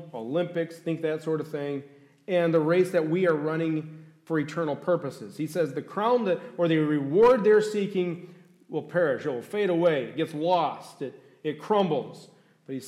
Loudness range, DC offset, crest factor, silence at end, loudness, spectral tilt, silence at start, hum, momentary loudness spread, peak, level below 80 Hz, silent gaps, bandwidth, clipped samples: 4 LU; under 0.1%; 14 dB; 0 s; -26 LUFS; -7 dB/octave; 0 s; none; 13 LU; -12 dBFS; -70 dBFS; none; 13.5 kHz; under 0.1%